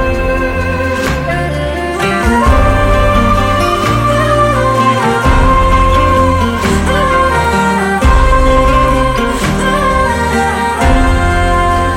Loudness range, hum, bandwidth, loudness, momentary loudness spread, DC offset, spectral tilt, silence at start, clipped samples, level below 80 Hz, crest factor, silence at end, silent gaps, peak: 1 LU; none; 16.5 kHz; -11 LUFS; 5 LU; under 0.1%; -5.5 dB/octave; 0 s; under 0.1%; -16 dBFS; 10 dB; 0 s; none; 0 dBFS